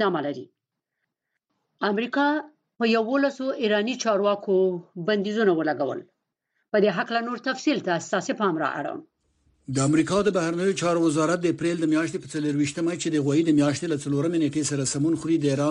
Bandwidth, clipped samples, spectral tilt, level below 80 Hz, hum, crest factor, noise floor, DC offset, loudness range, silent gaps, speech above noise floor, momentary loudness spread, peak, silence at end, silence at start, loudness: 11 kHz; under 0.1%; -5 dB/octave; -64 dBFS; none; 16 dB; -81 dBFS; under 0.1%; 3 LU; none; 58 dB; 7 LU; -8 dBFS; 0 s; 0 s; -24 LUFS